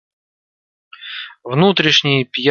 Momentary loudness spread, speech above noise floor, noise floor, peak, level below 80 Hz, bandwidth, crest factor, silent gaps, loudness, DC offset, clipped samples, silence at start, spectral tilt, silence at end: 18 LU; over 76 dB; under -90 dBFS; 0 dBFS; -60 dBFS; 7.2 kHz; 18 dB; none; -14 LUFS; under 0.1%; under 0.1%; 1 s; -4.5 dB/octave; 0 s